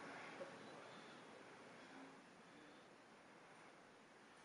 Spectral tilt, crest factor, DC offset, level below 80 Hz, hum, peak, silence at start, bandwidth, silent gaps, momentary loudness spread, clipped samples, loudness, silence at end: -4 dB/octave; 18 dB; under 0.1%; under -90 dBFS; none; -42 dBFS; 0 s; 10.5 kHz; none; 10 LU; under 0.1%; -60 LUFS; 0 s